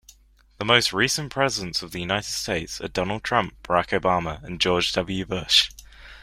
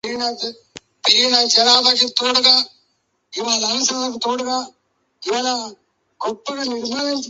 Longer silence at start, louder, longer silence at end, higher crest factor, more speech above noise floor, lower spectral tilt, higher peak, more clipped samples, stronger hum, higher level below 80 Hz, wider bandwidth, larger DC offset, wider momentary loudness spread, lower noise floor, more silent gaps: first, 0.6 s vs 0.05 s; second, -23 LUFS vs -16 LUFS; about the same, 0 s vs 0 s; about the same, 24 dB vs 20 dB; second, 32 dB vs 49 dB; first, -3 dB/octave vs 0 dB/octave; about the same, -2 dBFS vs 0 dBFS; neither; neither; first, -48 dBFS vs -66 dBFS; first, 16 kHz vs 8.2 kHz; neither; second, 10 LU vs 16 LU; second, -56 dBFS vs -67 dBFS; neither